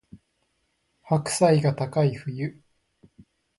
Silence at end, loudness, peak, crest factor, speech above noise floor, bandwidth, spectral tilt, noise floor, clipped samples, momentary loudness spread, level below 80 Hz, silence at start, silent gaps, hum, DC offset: 1.1 s; -24 LUFS; -8 dBFS; 20 dB; 50 dB; 11.5 kHz; -6 dB/octave; -73 dBFS; under 0.1%; 13 LU; -62 dBFS; 0.15 s; none; none; under 0.1%